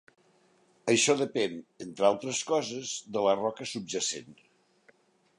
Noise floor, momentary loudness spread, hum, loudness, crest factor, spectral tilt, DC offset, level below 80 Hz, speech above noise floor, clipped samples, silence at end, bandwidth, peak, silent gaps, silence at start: -66 dBFS; 12 LU; none; -29 LUFS; 20 dB; -3 dB/octave; under 0.1%; -76 dBFS; 36 dB; under 0.1%; 1.05 s; 11.5 kHz; -10 dBFS; none; 0.85 s